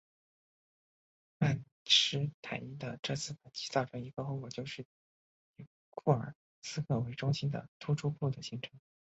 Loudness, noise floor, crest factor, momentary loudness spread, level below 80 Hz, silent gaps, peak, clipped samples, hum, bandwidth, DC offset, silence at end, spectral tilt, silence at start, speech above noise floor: -35 LUFS; under -90 dBFS; 24 dB; 15 LU; -70 dBFS; 1.72-1.85 s, 2.34-2.43 s, 2.99-3.03 s, 4.85-5.54 s, 5.67-5.92 s, 6.35-6.62 s, 7.68-7.80 s; -12 dBFS; under 0.1%; none; 8 kHz; under 0.1%; 0.4 s; -4 dB/octave; 1.4 s; over 55 dB